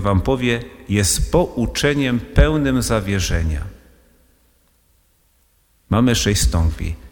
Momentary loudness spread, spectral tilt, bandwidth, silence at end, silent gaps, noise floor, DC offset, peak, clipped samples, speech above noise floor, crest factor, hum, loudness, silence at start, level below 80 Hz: 7 LU; -5 dB/octave; over 20 kHz; 0.05 s; none; -59 dBFS; under 0.1%; 0 dBFS; under 0.1%; 42 dB; 18 dB; none; -18 LUFS; 0 s; -26 dBFS